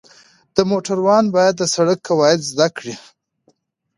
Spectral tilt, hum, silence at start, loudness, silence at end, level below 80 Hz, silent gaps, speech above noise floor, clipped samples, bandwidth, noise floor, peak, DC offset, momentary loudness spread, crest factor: -4.5 dB/octave; none; 0.55 s; -16 LUFS; 1 s; -60 dBFS; none; 46 dB; under 0.1%; 11.5 kHz; -62 dBFS; 0 dBFS; under 0.1%; 10 LU; 18 dB